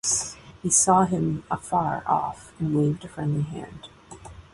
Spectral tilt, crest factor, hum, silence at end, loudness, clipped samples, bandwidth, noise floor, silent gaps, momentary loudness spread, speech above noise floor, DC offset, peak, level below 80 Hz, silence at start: -4.5 dB/octave; 20 dB; none; 0.1 s; -24 LUFS; under 0.1%; 11.5 kHz; -44 dBFS; none; 24 LU; 20 dB; under 0.1%; -6 dBFS; -52 dBFS; 0.05 s